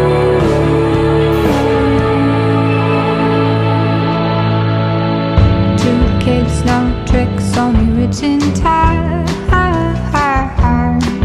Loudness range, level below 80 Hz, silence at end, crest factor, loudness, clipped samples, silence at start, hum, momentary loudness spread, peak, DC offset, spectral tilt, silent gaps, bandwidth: 1 LU; -22 dBFS; 0 s; 12 dB; -13 LUFS; under 0.1%; 0 s; none; 3 LU; 0 dBFS; under 0.1%; -7 dB/octave; none; 12.5 kHz